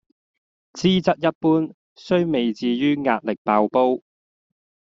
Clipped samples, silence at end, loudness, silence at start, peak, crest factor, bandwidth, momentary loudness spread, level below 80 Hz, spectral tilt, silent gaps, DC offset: under 0.1%; 1 s; -21 LUFS; 0.75 s; -2 dBFS; 20 dB; 7.6 kHz; 4 LU; -60 dBFS; -5 dB/octave; 1.35-1.41 s, 1.74-1.96 s, 3.38-3.45 s; under 0.1%